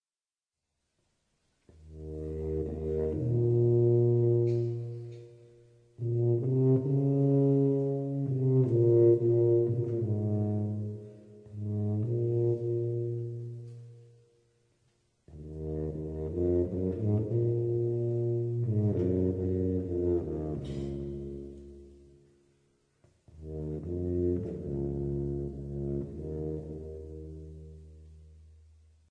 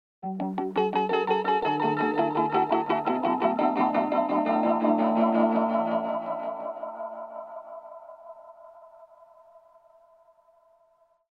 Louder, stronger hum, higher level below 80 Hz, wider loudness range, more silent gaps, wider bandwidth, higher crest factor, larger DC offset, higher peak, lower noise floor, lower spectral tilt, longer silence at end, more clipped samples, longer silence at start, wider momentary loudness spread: second, -30 LUFS vs -26 LUFS; neither; first, -50 dBFS vs -74 dBFS; second, 13 LU vs 17 LU; neither; second, 3.2 kHz vs 6.4 kHz; about the same, 18 dB vs 16 dB; neither; second, -14 dBFS vs -10 dBFS; first, under -90 dBFS vs -65 dBFS; first, -12 dB/octave vs -8 dB/octave; second, 0.7 s vs 2.3 s; neither; first, 1.8 s vs 0.25 s; about the same, 19 LU vs 18 LU